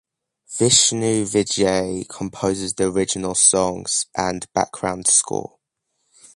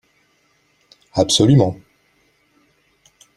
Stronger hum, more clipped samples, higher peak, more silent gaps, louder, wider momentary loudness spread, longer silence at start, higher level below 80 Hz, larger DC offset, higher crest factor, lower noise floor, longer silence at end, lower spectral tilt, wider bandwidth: neither; neither; about the same, 0 dBFS vs 0 dBFS; neither; second, -19 LUFS vs -15 LUFS; about the same, 13 LU vs 15 LU; second, 0.5 s vs 1.15 s; about the same, -50 dBFS vs -50 dBFS; neither; about the same, 20 dB vs 20 dB; first, -74 dBFS vs -61 dBFS; second, 0.9 s vs 1.6 s; second, -2.5 dB/octave vs -5.5 dB/octave; second, 11.5 kHz vs 13 kHz